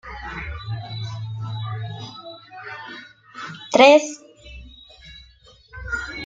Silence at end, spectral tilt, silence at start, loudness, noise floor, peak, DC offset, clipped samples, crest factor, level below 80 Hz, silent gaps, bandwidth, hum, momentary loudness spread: 0 s; -4.5 dB/octave; 0.05 s; -21 LUFS; -51 dBFS; -2 dBFS; under 0.1%; under 0.1%; 22 dB; -46 dBFS; none; 9 kHz; none; 29 LU